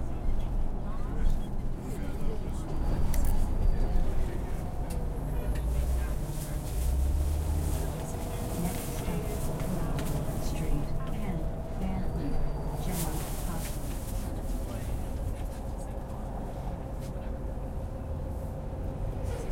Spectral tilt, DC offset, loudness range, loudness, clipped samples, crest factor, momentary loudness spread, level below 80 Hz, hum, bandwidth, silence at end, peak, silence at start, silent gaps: -6.5 dB/octave; under 0.1%; 5 LU; -35 LUFS; under 0.1%; 16 dB; 6 LU; -32 dBFS; none; 16.5 kHz; 0 s; -14 dBFS; 0 s; none